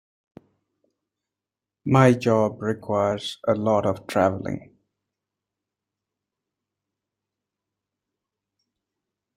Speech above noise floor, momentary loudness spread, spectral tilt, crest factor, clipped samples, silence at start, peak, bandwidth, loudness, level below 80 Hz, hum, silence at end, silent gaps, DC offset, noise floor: 67 dB; 14 LU; -7 dB/octave; 24 dB; under 0.1%; 1.85 s; -2 dBFS; 14.5 kHz; -22 LUFS; -62 dBFS; none; 4.75 s; none; under 0.1%; -88 dBFS